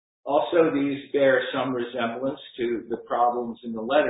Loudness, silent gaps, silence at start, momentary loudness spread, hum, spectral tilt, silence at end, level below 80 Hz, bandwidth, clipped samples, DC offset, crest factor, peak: -25 LUFS; none; 0.25 s; 10 LU; none; -10 dB/octave; 0 s; -66 dBFS; 4 kHz; under 0.1%; under 0.1%; 18 dB; -6 dBFS